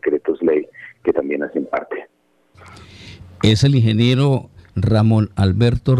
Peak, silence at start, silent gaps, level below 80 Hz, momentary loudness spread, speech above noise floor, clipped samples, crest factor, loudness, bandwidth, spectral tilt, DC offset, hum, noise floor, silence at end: -2 dBFS; 0.05 s; none; -40 dBFS; 15 LU; 43 dB; under 0.1%; 16 dB; -17 LUFS; 10.5 kHz; -7.5 dB/octave; under 0.1%; none; -58 dBFS; 0 s